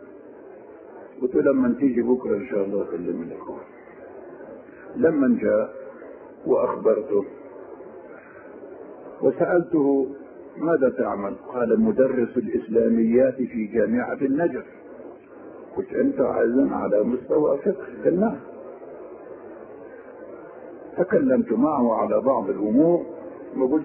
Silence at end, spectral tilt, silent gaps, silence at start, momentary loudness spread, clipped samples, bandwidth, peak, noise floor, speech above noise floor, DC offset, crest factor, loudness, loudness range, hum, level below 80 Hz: 0 s; -13 dB/octave; none; 0 s; 22 LU; under 0.1%; 3.1 kHz; -6 dBFS; -43 dBFS; 22 dB; under 0.1%; 16 dB; -22 LUFS; 5 LU; none; -60 dBFS